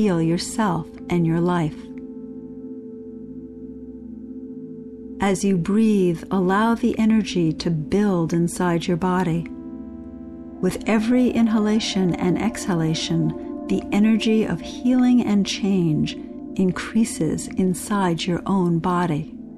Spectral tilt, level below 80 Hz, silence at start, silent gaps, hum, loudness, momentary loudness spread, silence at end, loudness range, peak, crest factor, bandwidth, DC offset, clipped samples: -6 dB/octave; -48 dBFS; 0 s; none; none; -21 LUFS; 18 LU; 0 s; 7 LU; -10 dBFS; 12 dB; 13 kHz; under 0.1%; under 0.1%